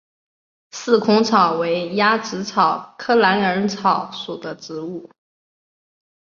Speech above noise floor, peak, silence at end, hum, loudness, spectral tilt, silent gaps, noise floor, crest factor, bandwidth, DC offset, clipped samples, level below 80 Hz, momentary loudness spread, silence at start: over 71 dB; -2 dBFS; 1.15 s; none; -18 LUFS; -4.5 dB/octave; none; under -90 dBFS; 18 dB; 7.4 kHz; under 0.1%; under 0.1%; -64 dBFS; 15 LU; 0.75 s